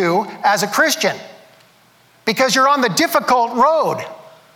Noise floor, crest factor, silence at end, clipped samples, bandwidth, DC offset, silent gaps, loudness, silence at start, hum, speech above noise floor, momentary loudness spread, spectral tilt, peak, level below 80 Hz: -52 dBFS; 14 dB; 0.35 s; under 0.1%; 19.5 kHz; under 0.1%; none; -16 LUFS; 0 s; none; 36 dB; 10 LU; -3 dB/octave; -4 dBFS; -62 dBFS